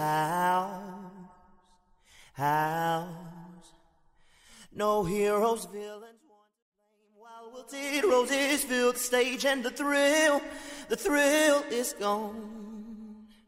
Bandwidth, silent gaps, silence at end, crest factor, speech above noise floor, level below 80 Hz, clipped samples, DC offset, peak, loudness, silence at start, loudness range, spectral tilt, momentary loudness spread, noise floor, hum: 16 kHz; 6.62-6.72 s; 0.25 s; 18 dB; 37 dB; -62 dBFS; under 0.1%; under 0.1%; -12 dBFS; -27 LUFS; 0 s; 8 LU; -3 dB/octave; 22 LU; -65 dBFS; none